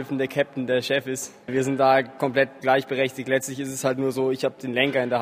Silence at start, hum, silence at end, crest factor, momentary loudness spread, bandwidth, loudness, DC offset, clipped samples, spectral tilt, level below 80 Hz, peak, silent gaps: 0 s; none; 0 s; 20 dB; 6 LU; 15.5 kHz; -24 LUFS; under 0.1%; under 0.1%; -4.5 dB/octave; -68 dBFS; -4 dBFS; none